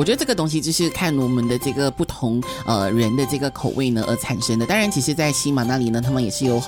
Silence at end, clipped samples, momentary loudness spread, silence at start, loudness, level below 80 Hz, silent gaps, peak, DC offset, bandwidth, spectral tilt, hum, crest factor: 0 s; under 0.1%; 4 LU; 0 s; -20 LUFS; -44 dBFS; none; -4 dBFS; under 0.1%; 18.5 kHz; -5 dB/octave; none; 16 dB